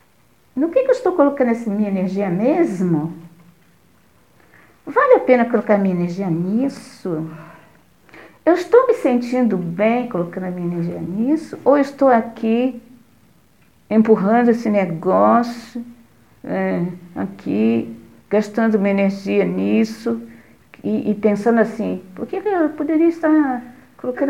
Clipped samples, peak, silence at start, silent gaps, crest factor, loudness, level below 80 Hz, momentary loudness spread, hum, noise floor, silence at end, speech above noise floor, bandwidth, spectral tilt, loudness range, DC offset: under 0.1%; 0 dBFS; 0.55 s; none; 18 dB; -18 LUFS; -62 dBFS; 14 LU; none; -57 dBFS; 0 s; 39 dB; 11.5 kHz; -8 dB/octave; 3 LU; 0.2%